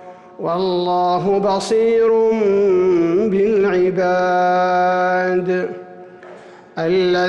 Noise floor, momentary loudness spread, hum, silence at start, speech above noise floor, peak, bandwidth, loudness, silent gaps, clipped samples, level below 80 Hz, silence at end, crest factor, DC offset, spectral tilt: -40 dBFS; 7 LU; none; 0 s; 24 dB; -8 dBFS; 11 kHz; -16 LUFS; none; under 0.1%; -54 dBFS; 0 s; 8 dB; under 0.1%; -6 dB/octave